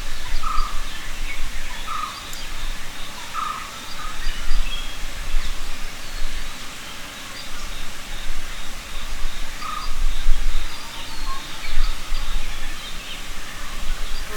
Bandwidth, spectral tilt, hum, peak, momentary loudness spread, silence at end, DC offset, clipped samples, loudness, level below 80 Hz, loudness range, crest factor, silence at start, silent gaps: 13.5 kHz; -2.5 dB/octave; none; 0 dBFS; 6 LU; 0 s; under 0.1%; under 0.1%; -30 LUFS; -24 dBFS; 3 LU; 18 dB; 0 s; none